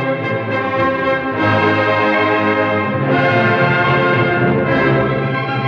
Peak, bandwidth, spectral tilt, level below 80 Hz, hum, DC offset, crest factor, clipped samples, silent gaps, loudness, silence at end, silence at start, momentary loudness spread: -2 dBFS; 6.8 kHz; -8 dB/octave; -46 dBFS; none; under 0.1%; 12 dB; under 0.1%; none; -15 LUFS; 0 s; 0 s; 5 LU